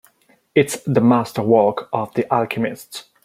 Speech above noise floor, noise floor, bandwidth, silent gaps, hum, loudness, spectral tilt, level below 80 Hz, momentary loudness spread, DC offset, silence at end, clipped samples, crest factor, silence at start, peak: 39 dB; -57 dBFS; 16 kHz; none; none; -18 LUFS; -6 dB/octave; -60 dBFS; 9 LU; under 0.1%; 0.25 s; under 0.1%; 18 dB; 0.55 s; -2 dBFS